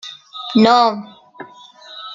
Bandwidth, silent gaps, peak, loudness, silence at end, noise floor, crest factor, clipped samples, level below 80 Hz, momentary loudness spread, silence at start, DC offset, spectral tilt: 7.6 kHz; none; 0 dBFS; -14 LUFS; 0 s; -41 dBFS; 18 dB; under 0.1%; -62 dBFS; 25 LU; 0.05 s; under 0.1%; -5.5 dB/octave